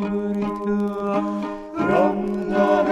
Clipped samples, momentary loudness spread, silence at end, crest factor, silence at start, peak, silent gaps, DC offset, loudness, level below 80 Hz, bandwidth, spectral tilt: under 0.1%; 7 LU; 0 s; 16 dB; 0 s; -4 dBFS; none; under 0.1%; -22 LUFS; -50 dBFS; 8.6 kHz; -8 dB/octave